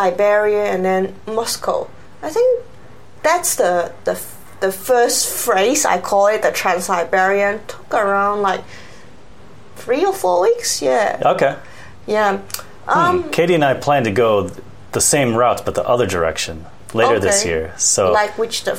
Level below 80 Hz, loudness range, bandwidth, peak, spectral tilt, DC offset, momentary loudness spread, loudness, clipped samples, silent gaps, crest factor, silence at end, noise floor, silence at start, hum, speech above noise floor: -48 dBFS; 3 LU; 16.5 kHz; 0 dBFS; -3 dB/octave; 1%; 10 LU; -17 LUFS; under 0.1%; none; 16 dB; 0 s; -43 dBFS; 0 s; none; 27 dB